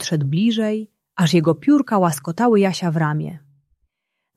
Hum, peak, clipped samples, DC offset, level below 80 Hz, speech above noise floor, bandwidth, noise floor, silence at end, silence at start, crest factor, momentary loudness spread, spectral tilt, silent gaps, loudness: none; -4 dBFS; under 0.1%; under 0.1%; -62 dBFS; 60 dB; 14 kHz; -78 dBFS; 1 s; 0 s; 16 dB; 10 LU; -6 dB/octave; none; -19 LUFS